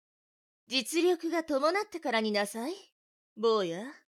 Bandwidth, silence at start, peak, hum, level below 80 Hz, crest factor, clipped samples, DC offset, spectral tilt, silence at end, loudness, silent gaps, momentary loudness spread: 16 kHz; 0.7 s; -14 dBFS; none; -80 dBFS; 18 dB; under 0.1%; under 0.1%; -3.5 dB/octave; 0.15 s; -30 LUFS; 2.92-3.36 s; 8 LU